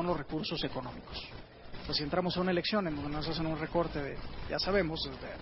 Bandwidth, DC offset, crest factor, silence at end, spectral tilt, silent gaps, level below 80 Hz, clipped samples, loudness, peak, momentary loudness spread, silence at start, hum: 5.8 kHz; under 0.1%; 18 dB; 0 s; -9 dB/octave; none; -50 dBFS; under 0.1%; -34 LUFS; -16 dBFS; 12 LU; 0 s; none